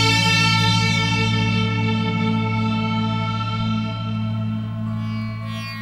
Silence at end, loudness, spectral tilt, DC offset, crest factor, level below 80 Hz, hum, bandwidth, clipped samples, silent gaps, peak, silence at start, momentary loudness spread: 0 s; -20 LUFS; -5 dB/octave; under 0.1%; 16 dB; -42 dBFS; none; 12.5 kHz; under 0.1%; none; -4 dBFS; 0 s; 11 LU